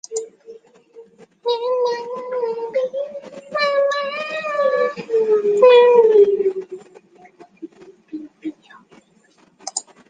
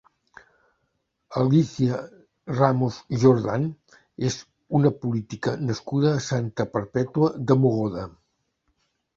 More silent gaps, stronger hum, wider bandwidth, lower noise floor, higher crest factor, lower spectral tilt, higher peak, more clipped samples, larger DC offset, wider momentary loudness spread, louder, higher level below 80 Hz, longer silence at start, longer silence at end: neither; neither; first, 9.6 kHz vs 7.6 kHz; second, -56 dBFS vs -74 dBFS; about the same, 18 dB vs 22 dB; second, -2.5 dB/octave vs -7.5 dB/octave; about the same, -2 dBFS vs -2 dBFS; neither; neither; first, 24 LU vs 12 LU; first, -18 LUFS vs -24 LUFS; second, -74 dBFS vs -58 dBFS; second, 0.1 s vs 1.3 s; second, 0.3 s vs 1.1 s